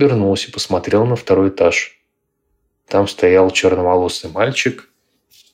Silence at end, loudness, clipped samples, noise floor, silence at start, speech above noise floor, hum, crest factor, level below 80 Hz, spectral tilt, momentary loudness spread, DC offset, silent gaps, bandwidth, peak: 0.7 s; -15 LUFS; under 0.1%; -70 dBFS; 0 s; 55 dB; none; 14 dB; -54 dBFS; -5 dB/octave; 8 LU; under 0.1%; none; 14 kHz; -2 dBFS